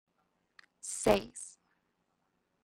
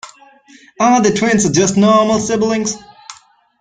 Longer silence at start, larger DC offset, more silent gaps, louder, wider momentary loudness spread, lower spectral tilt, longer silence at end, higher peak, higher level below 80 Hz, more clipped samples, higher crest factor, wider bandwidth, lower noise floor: first, 0.85 s vs 0.05 s; neither; neither; second, -32 LUFS vs -13 LUFS; first, 17 LU vs 7 LU; about the same, -3.5 dB/octave vs -4.5 dB/octave; first, 1.15 s vs 0.5 s; second, -12 dBFS vs -2 dBFS; second, -60 dBFS vs -48 dBFS; neither; first, 26 dB vs 14 dB; first, 16 kHz vs 9.6 kHz; first, -79 dBFS vs -43 dBFS